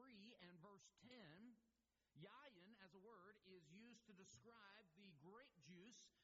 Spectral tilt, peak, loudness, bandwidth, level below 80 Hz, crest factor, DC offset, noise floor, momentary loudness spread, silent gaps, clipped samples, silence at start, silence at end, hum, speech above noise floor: -3.5 dB/octave; -50 dBFS; -67 LUFS; 7.4 kHz; under -90 dBFS; 18 dB; under 0.1%; -90 dBFS; 3 LU; none; under 0.1%; 0 s; 0 s; none; 22 dB